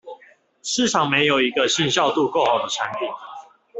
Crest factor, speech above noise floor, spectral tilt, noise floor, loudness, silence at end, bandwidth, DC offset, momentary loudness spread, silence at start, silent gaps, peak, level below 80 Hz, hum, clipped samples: 18 dB; 32 dB; -3 dB/octave; -53 dBFS; -20 LUFS; 0 s; 8.4 kHz; under 0.1%; 13 LU; 0.05 s; none; -4 dBFS; -64 dBFS; none; under 0.1%